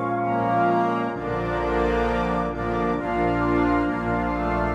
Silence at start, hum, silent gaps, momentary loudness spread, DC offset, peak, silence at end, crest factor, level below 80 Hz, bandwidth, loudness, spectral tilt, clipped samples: 0 s; none; none; 5 LU; under 0.1%; -10 dBFS; 0 s; 14 dB; -36 dBFS; 9 kHz; -23 LUFS; -8 dB/octave; under 0.1%